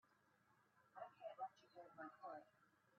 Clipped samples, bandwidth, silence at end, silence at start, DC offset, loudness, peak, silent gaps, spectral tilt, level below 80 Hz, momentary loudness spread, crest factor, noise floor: under 0.1%; 6 kHz; 0 s; 0.05 s; under 0.1%; -58 LUFS; -40 dBFS; none; -3 dB/octave; under -90 dBFS; 10 LU; 20 dB; -79 dBFS